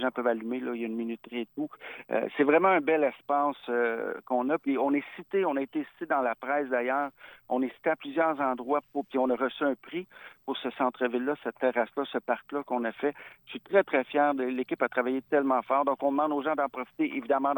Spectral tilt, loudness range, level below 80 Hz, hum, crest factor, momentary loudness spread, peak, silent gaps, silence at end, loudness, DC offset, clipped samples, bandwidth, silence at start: -8 dB/octave; 4 LU; -80 dBFS; none; 18 dB; 9 LU; -10 dBFS; none; 0 s; -29 LUFS; under 0.1%; under 0.1%; 19 kHz; 0 s